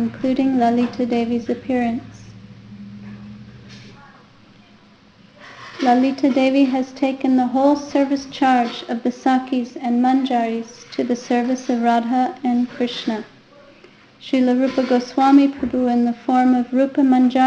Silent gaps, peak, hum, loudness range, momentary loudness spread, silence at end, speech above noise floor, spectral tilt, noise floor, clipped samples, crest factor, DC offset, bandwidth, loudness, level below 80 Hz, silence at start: none; -2 dBFS; none; 8 LU; 13 LU; 0 s; 32 dB; -5.5 dB/octave; -49 dBFS; under 0.1%; 16 dB; under 0.1%; 7.8 kHz; -19 LUFS; -58 dBFS; 0 s